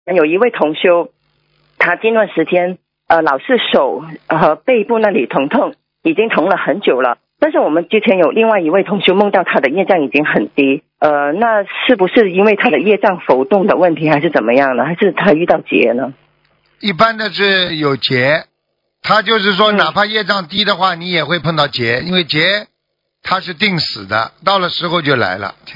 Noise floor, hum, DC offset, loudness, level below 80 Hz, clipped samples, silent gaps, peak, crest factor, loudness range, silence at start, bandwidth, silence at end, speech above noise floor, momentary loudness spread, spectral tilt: -71 dBFS; none; under 0.1%; -13 LUFS; -56 dBFS; 0.2%; none; 0 dBFS; 14 dB; 3 LU; 0.05 s; 6 kHz; 0 s; 58 dB; 6 LU; -6.5 dB/octave